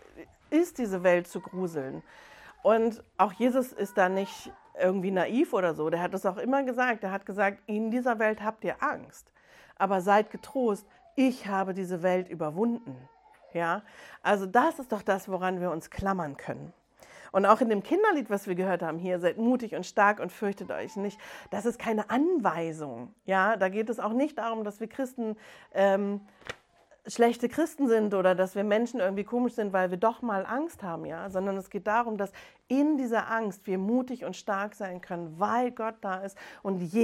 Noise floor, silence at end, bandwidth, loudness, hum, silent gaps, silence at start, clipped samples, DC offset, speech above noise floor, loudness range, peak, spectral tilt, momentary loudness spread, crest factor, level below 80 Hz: -61 dBFS; 0 s; 16 kHz; -29 LUFS; none; none; 0.15 s; under 0.1%; under 0.1%; 33 dB; 3 LU; -6 dBFS; -6 dB/octave; 12 LU; 24 dB; -66 dBFS